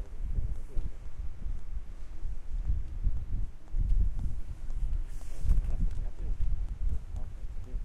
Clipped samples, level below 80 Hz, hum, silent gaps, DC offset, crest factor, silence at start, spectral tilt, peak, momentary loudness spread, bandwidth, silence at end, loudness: under 0.1%; -32 dBFS; none; none; under 0.1%; 14 dB; 0 s; -7.5 dB/octave; -14 dBFS; 11 LU; 2.9 kHz; 0 s; -38 LUFS